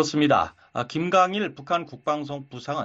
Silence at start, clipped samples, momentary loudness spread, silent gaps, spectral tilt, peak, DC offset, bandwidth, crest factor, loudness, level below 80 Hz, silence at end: 0 s; under 0.1%; 11 LU; none; -5 dB/octave; -8 dBFS; under 0.1%; 7.8 kHz; 18 dB; -24 LUFS; -62 dBFS; 0 s